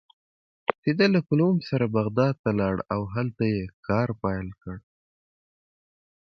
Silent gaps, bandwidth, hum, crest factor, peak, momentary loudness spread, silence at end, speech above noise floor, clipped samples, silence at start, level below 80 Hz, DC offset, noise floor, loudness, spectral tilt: 0.78-0.83 s, 2.39-2.44 s, 3.74-3.83 s; 6.4 kHz; none; 26 dB; -2 dBFS; 11 LU; 1.5 s; over 65 dB; under 0.1%; 0.7 s; -52 dBFS; under 0.1%; under -90 dBFS; -25 LUFS; -8.5 dB/octave